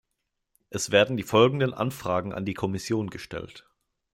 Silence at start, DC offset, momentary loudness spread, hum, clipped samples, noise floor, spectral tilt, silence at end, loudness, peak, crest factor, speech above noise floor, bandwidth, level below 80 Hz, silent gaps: 0.7 s; under 0.1%; 16 LU; none; under 0.1%; -80 dBFS; -5 dB/octave; 0.55 s; -25 LUFS; -6 dBFS; 22 dB; 55 dB; 16 kHz; -60 dBFS; none